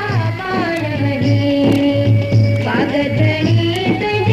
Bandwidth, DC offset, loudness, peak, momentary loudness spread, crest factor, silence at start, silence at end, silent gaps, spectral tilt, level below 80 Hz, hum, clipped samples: 8.6 kHz; under 0.1%; -15 LUFS; -2 dBFS; 5 LU; 12 dB; 0 s; 0 s; none; -7.5 dB/octave; -42 dBFS; none; under 0.1%